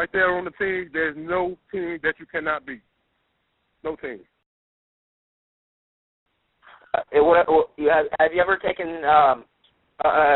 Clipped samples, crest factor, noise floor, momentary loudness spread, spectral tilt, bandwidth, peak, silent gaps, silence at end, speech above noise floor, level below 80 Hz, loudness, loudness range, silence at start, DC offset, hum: under 0.1%; 20 dB; -72 dBFS; 16 LU; -2.5 dB/octave; 4.1 kHz; -2 dBFS; 4.46-6.26 s; 0 s; 50 dB; -54 dBFS; -22 LUFS; 20 LU; 0 s; under 0.1%; none